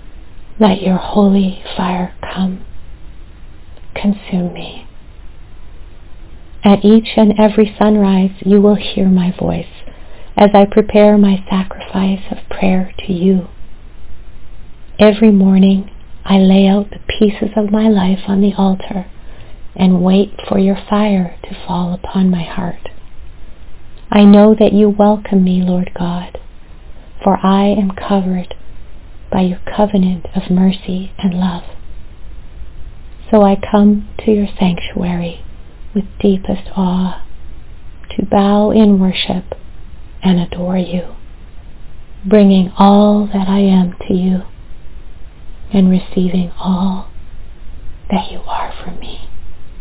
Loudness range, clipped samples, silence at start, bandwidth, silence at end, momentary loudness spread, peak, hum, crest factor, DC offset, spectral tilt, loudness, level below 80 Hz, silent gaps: 8 LU; 0.4%; 0.05 s; 4 kHz; 0 s; 14 LU; 0 dBFS; none; 14 dB; under 0.1%; -12 dB/octave; -13 LUFS; -34 dBFS; none